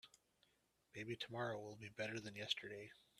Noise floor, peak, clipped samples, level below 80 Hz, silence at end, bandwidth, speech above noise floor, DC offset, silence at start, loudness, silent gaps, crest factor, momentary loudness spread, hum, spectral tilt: -81 dBFS; -26 dBFS; under 0.1%; -84 dBFS; 0.15 s; 14 kHz; 33 dB; under 0.1%; 0.05 s; -48 LUFS; none; 26 dB; 11 LU; none; -4 dB/octave